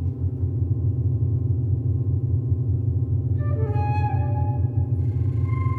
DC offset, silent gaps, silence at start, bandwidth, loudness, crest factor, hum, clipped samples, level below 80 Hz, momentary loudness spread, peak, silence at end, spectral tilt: under 0.1%; none; 0 s; 2.7 kHz; -24 LUFS; 10 dB; none; under 0.1%; -38 dBFS; 1 LU; -12 dBFS; 0 s; -11.5 dB/octave